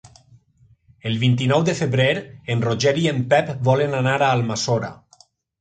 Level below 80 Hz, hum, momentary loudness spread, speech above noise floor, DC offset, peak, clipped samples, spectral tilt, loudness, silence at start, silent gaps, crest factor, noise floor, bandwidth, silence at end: -56 dBFS; none; 8 LU; 37 dB; under 0.1%; -4 dBFS; under 0.1%; -5.5 dB/octave; -20 LUFS; 1.05 s; none; 18 dB; -57 dBFS; 9.2 kHz; 0.65 s